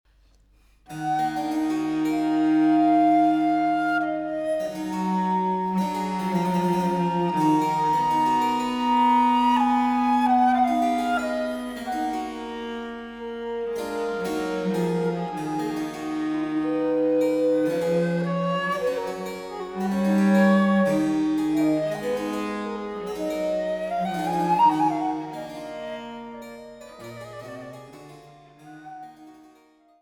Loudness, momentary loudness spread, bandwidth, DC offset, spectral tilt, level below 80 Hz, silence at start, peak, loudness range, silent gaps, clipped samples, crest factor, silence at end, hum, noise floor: -24 LUFS; 16 LU; 17.5 kHz; under 0.1%; -6.5 dB/octave; -58 dBFS; 0.9 s; -8 dBFS; 9 LU; none; under 0.1%; 16 dB; 0.7 s; none; -58 dBFS